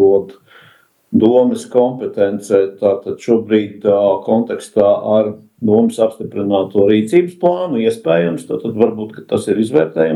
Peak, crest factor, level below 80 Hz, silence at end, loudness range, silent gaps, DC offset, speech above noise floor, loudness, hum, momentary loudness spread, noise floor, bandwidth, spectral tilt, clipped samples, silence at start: 0 dBFS; 14 dB; -60 dBFS; 0 s; 1 LU; none; under 0.1%; 35 dB; -15 LUFS; none; 7 LU; -49 dBFS; 12.5 kHz; -7 dB/octave; under 0.1%; 0 s